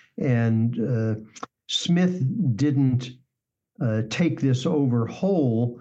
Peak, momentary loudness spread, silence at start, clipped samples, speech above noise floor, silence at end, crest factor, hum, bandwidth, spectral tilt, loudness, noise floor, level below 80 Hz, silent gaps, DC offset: -12 dBFS; 7 LU; 0.2 s; under 0.1%; 60 dB; 0 s; 12 dB; none; 8.2 kHz; -7 dB/octave; -24 LUFS; -83 dBFS; -66 dBFS; none; under 0.1%